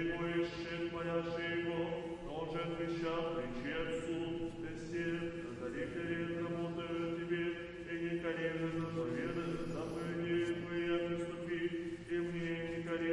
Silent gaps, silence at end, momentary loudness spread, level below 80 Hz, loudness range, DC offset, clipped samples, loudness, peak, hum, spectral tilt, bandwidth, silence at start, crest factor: none; 0 s; 5 LU; -60 dBFS; 2 LU; under 0.1%; under 0.1%; -39 LUFS; -24 dBFS; none; -6.5 dB/octave; 11 kHz; 0 s; 14 dB